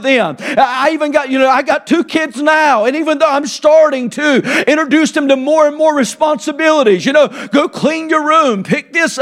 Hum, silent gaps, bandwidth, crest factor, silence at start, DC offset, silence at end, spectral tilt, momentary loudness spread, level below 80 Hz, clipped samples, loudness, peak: none; none; 13.5 kHz; 12 dB; 0 s; under 0.1%; 0 s; -4 dB/octave; 5 LU; -60 dBFS; under 0.1%; -12 LUFS; 0 dBFS